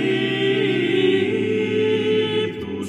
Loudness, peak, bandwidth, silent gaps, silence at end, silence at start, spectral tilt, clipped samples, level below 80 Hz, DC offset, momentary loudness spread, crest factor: -20 LUFS; -8 dBFS; 10.5 kHz; none; 0 s; 0 s; -6 dB/octave; under 0.1%; -60 dBFS; under 0.1%; 4 LU; 12 dB